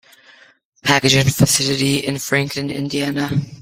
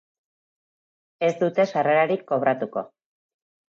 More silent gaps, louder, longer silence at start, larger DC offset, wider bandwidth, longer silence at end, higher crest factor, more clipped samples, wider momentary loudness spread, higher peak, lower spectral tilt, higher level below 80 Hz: neither; first, -17 LUFS vs -23 LUFS; second, 0.85 s vs 1.2 s; neither; first, 16.5 kHz vs 7.6 kHz; second, 0 s vs 0.8 s; about the same, 18 dB vs 16 dB; neither; about the same, 9 LU vs 11 LU; first, 0 dBFS vs -8 dBFS; second, -4 dB/octave vs -6.5 dB/octave; first, -48 dBFS vs -80 dBFS